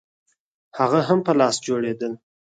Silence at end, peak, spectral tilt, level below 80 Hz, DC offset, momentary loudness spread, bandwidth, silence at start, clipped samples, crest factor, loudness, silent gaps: 0.4 s; -4 dBFS; -5 dB/octave; -68 dBFS; under 0.1%; 15 LU; 9.4 kHz; 0.75 s; under 0.1%; 18 dB; -21 LUFS; none